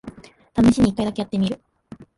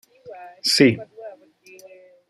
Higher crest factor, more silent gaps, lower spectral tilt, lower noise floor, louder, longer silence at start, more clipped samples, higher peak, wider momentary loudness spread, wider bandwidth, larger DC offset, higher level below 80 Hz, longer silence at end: second, 16 dB vs 22 dB; neither; first, -6.5 dB/octave vs -4 dB/octave; second, -44 dBFS vs -49 dBFS; about the same, -20 LUFS vs -18 LUFS; second, 0.05 s vs 0.25 s; neither; second, -6 dBFS vs -2 dBFS; second, 16 LU vs 25 LU; second, 11.5 kHz vs 15 kHz; neither; first, -42 dBFS vs -66 dBFS; second, 0.15 s vs 1 s